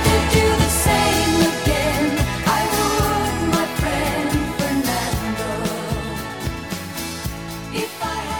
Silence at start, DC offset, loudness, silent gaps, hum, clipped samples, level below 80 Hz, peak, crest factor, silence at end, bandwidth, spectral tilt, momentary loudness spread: 0 s; 0.2%; -20 LUFS; none; none; under 0.1%; -30 dBFS; -2 dBFS; 18 dB; 0 s; 19.5 kHz; -4.5 dB/octave; 11 LU